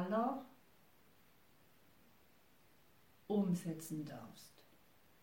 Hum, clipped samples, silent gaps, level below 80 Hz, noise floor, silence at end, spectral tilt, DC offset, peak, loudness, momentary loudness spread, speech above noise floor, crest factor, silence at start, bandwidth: none; under 0.1%; none; -82 dBFS; -70 dBFS; 0.75 s; -7 dB/octave; under 0.1%; -26 dBFS; -41 LUFS; 24 LU; 31 dB; 20 dB; 0 s; 16.5 kHz